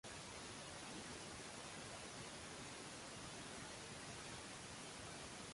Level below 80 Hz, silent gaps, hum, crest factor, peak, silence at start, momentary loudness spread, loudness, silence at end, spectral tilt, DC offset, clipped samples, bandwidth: -70 dBFS; none; none; 14 dB; -40 dBFS; 0.05 s; 1 LU; -52 LUFS; 0 s; -2.5 dB/octave; under 0.1%; under 0.1%; 11.5 kHz